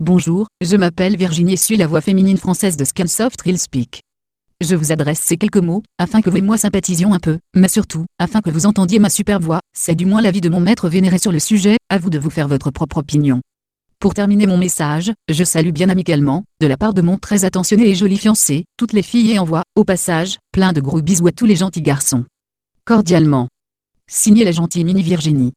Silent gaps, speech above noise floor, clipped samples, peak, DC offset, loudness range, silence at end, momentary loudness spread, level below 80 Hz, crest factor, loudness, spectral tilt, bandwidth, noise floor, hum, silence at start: none; 58 dB; under 0.1%; 0 dBFS; under 0.1%; 3 LU; 0.05 s; 6 LU; -44 dBFS; 14 dB; -15 LUFS; -5.5 dB/octave; 15.5 kHz; -72 dBFS; none; 0 s